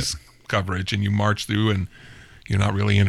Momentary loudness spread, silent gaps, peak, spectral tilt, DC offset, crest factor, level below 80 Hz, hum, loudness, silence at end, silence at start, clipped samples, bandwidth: 6 LU; none; -6 dBFS; -5.5 dB/octave; under 0.1%; 18 dB; -46 dBFS; none; -23 LUFS; 0 s; 0 s; under 0.1%; 12.5 kHz